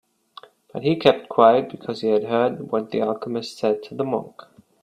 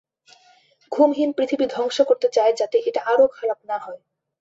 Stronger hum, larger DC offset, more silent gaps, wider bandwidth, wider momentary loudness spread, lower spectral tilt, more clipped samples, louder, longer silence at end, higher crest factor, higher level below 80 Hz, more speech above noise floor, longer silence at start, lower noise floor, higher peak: neither; neither; neither; first, 12 kHz vs 8 kHz; about the same, 12 LU vs 11 LU; first, -6.5 dB/octave vs -3.5 dB/octave; neither; about the same, -21 LUFS vs -20 LUFS; about the same, 0.55 s vs 0.45 s; first, 22 dB vs 16 dB; about the same, -64 dBFS vs -68 dBFS; second, 27 dB vs 37 dB; second, 0.75 s vs 0.9 s; second, -48 dBFS vs -57 dBFS; first, 0 dBFS vs -6 dBFS